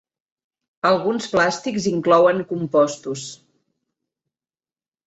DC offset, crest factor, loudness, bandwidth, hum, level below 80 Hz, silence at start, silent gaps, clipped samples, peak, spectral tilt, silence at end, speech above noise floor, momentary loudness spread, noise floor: under 0.1%; 18 dB; -19 LUFS; 8.2 kHz; none; -62 dBFS; 0.85 s; none; under 0.1%; -4 dBFS; -5 dB/octave; 1.7 s; over 71 dB; 14 LU; under -90 dBFS